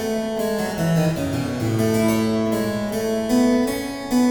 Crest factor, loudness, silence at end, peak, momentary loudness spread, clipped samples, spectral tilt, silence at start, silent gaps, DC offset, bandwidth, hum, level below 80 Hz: 14 dB; -21 LUFS; 0 s; -8 dBFS; 5 LU; under 0.1%; -6 dB/octave; 0 s; none; under 0.1%; over 20 kHz; none; -46 dBFS